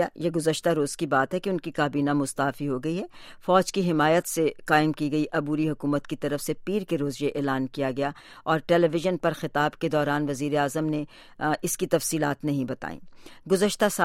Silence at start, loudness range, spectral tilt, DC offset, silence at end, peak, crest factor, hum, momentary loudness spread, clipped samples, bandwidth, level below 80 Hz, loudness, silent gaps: 0 s; 3 LU; -5 dB/octave; under 0.1%; 0 s; -6 dBFS; 20 dB; none; 8 LU; under 0.1%; 16 kHz; -56 dBFS; -26 LUFS; none